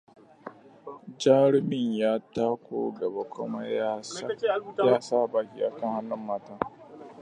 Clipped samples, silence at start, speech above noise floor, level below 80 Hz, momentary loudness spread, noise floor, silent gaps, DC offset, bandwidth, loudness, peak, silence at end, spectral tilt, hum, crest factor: under 0.1%; 0.45 s; 20 dB; -70 dBFS; 23 LU; -47 dBFS; none; under 0.1%; 10 kHz; -28 LUFS; -8 dBFS; 0 s; -6 dB/octave; none; 20 dB